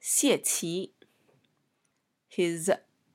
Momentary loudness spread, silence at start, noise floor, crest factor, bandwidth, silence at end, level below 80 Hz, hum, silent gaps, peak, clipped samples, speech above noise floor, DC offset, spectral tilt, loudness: 14 LU; 0.05 s; -77 dBFS; 20 dB; 16.5 kHz; 0.35 s; -84 dBFS; none; none; -10 dBFS; under 0.1%; 49 dB; under 0.1%; -3 dB/octave; -28 LUFS